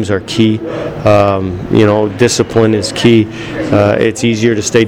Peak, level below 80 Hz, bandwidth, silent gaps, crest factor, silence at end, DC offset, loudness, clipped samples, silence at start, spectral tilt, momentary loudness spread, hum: 0 dBFS; -38 dBFS; 15 kHz; none; 10 dB; 0 s; under 0.1%; -11 LUFS; under 0.1%; 0 s; -5.5 dB/octave; 7 LU; none